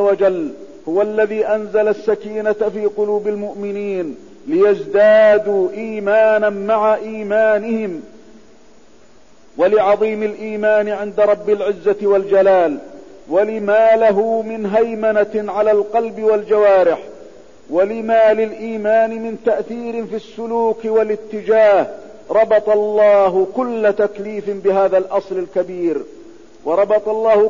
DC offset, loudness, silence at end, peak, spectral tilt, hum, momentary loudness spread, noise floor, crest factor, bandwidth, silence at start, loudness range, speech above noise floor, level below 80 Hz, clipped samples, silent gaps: 0.6%; -16 LUFS; 0 s; -4 dBFS; -6.5 dB/octave; none; 12 LU; -49 dBFS; 12 dB; 7.4 kHz; 0 s; 4 LU; 34 dB; -58 dBFS; under 0.1%; none